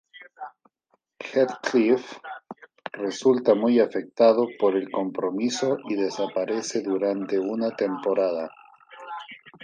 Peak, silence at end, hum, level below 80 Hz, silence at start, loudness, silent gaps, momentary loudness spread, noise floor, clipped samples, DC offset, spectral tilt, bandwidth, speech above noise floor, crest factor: -6 dBFS; 0.15 s; none; -78 dBFS; 0.15 s; -24 LUFS; none; 20 LU; -71 dBFS; under 0.1%; under 0.1%; -5 dB/octave; 9.8 kHz; 48 dB; 18 dB